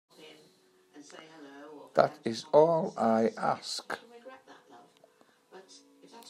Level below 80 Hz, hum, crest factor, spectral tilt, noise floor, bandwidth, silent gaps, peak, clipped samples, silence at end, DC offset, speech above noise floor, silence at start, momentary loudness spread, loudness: -84 dBFS; none; 24 dB; -5 dB/octave; -64 dBFS; 14.5 kHz; none; -8 dBFS; under 0.1%; 0 s; under 0.1%; 36 dB; 0.2 s; 27 LU; -29 LUFS